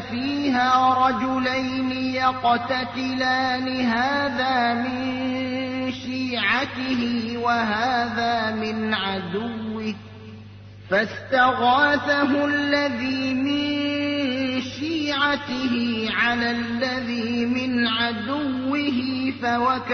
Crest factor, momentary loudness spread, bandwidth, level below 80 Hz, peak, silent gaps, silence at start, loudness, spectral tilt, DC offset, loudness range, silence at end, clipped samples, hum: 16 dB; 7 LU; 6.6 kHz; -56 dBFS; -6 dBFS; none; 0 s; -22 LUFS; -5 dB/octave; under 0.1%; 3 LU; 0 s; under 0.1%; none